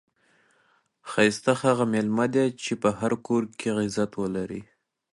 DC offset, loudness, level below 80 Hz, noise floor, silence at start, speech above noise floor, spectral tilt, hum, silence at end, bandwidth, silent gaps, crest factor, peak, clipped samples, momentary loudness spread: under 0.1%; -25 LUFS; -62 dBFS; -66 dBFS; 1.05 s; 41 dB; -5.5 dB/octave; none; 0.5 s; 11.5 kHz; none; 20 dB; -6 dBFS; under 0.1%; 9 LU